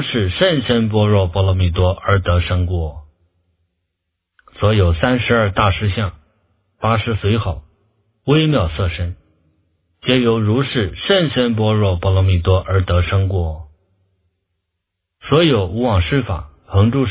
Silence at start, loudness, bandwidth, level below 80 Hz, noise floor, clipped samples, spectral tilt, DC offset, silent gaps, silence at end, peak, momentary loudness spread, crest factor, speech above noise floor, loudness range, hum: 0 s; -17 LUFS; 4 kHz; -28 dBFS; -77 dBFS; under 0.1%; -11 dB/octave; under 0.1%; none; 0 s; 0 dBFS; 9 LU; 16 dB; 61 dB; 4 LU; none